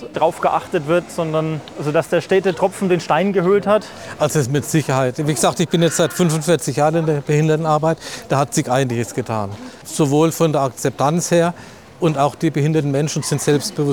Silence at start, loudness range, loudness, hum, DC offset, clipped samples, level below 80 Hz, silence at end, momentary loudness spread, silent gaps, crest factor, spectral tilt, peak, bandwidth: 0 s; 2 LU; -18 LUFS; none; 0.2%; under 0.1%; -56 dBFS; 0 s; 6 LU; none; 14 dB; -5.5 dB/octave; -4 dBFS; 19.5 kHz